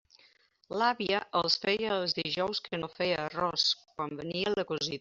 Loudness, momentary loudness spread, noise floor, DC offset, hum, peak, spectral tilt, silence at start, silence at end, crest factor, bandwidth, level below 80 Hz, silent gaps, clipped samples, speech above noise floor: -31 LUFS; 8 LU; -65 dBFS; under 0.1%; none; -12 dBFS; -1.5 dB/octave; 0.7 s; 0 s; 20 dB; 7.6 kHz; -68 dBFS; none; under 0.1%; 34 dB